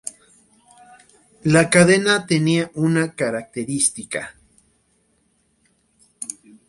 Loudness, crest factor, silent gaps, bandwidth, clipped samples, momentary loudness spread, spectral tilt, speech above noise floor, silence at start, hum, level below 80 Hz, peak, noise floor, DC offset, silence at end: -18 LUFS; 22 dB; none; 11.5 kHz; under 0.1%; 19 LU; -4.5 dB/octave; 46 dB; 0.05 s; none; -58 dBFS; 0 dBFS; -64 dBFS; under 0.1%; 0.35 s